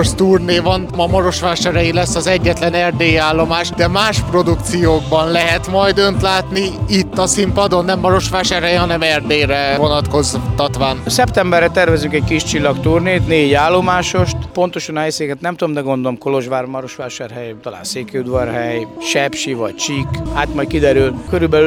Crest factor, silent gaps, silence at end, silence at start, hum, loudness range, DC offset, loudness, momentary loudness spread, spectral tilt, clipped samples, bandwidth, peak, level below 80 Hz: 14 dB; none; 0 s; 0 s; none; 6 LU; under 0.1%; -14 LUFS; 8 LU; -4.5 dB/octave; under 0.1%; 17 kHz; 0 dBFS; -32 dBFS